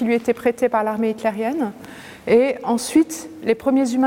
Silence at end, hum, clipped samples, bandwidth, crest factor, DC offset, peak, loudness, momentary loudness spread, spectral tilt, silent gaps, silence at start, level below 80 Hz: 0 s; none; under 0.1%; 17 kHz; 16 dB; under 0.1%; -4 dBFS; -20 LUFS; 10 LU; -5 dB/octave; none; 0 s; -58 dBFS